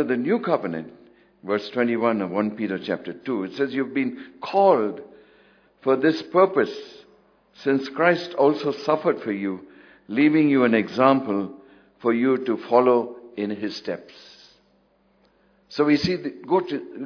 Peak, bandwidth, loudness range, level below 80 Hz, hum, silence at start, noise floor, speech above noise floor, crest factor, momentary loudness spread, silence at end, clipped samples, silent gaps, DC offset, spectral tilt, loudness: -2 dBFS; 5.4 kHz; 5 LU; -66 dBFS; none; 0 s; -62 dBFS; 40 dB; 20 dB; 13 LU; 0 s; under 0.1%; none; under 0.1%; -7 dB/octave; -23 LUFS